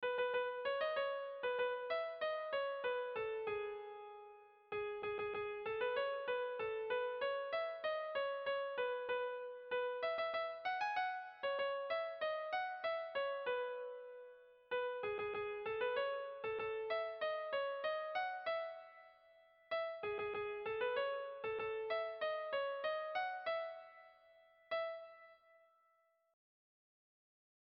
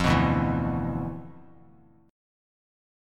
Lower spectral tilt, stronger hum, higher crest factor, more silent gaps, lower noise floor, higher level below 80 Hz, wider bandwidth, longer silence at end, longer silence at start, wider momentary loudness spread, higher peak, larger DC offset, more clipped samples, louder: second, 0.5 dB/octave vs -7 dB/octave; neither; second, 14 dB vs 20 dB; neither; first, -77 dBFS vs -56 dBFS; second, -80 dBFS vs -42 dBFS; second, 6.2 kHz vs 13 kHz; first, 2.35 s vs 1 s; about the same, 0 s vs 0 s; second, 9 LU vs 18 LU; second, -28 dBFS vs -8 dBFS; neither; neither; second, -41 LUFS vs -27 LUFS